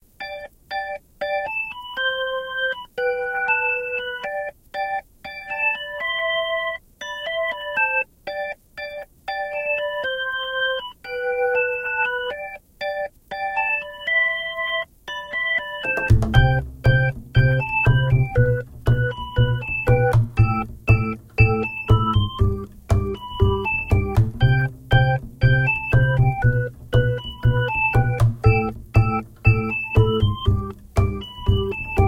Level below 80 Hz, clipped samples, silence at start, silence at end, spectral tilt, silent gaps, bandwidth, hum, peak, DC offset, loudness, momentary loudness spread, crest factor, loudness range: -32 dBFS; under 0.1%; 0.2 s; 0 s; -7 dB/octave; none; 10.5 kHz; none; 0 dBFS; under 0.1%; -21 LUFS; 11 LU; 20 dB; 5 LU